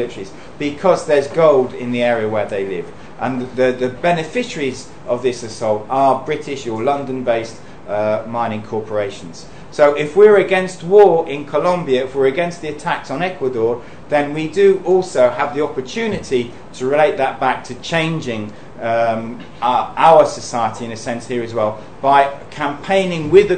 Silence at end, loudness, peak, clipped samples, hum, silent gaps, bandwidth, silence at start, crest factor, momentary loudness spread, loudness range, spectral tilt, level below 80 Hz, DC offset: 0 s; -17 LUFS; 0 dBFS; under 0.1%; none; none; 9.4 kHz; 0 s; 16 dB; 13 LU; 6 LU; -5.5 dB/octave; -50 dBFS; 1%